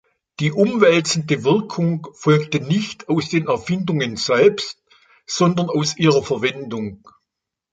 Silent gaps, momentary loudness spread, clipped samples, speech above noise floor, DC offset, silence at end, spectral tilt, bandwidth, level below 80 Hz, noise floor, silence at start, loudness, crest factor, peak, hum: none; 11 LU; under 0.1%; 63 dB; under 0.1%; 0.8 s; -5.5 dB/octave; 9.2 kHz; -58 dBFS; -81 dBFS; 0.4 s; -19 LUFS; 18 dB; 0 dBFS; none